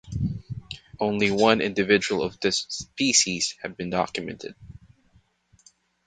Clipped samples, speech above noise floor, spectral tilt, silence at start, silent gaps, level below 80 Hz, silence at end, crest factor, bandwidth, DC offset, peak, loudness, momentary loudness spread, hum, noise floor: under 0.1%; 38 dB; -3 dB/octave; 0.05 s; none; -50 dBFS; 1.3 s; 24 dB; 9.8 kHz; under 0.1%; -2 dBFS; -24 LUFS; 17 LU; none; -62 dBFS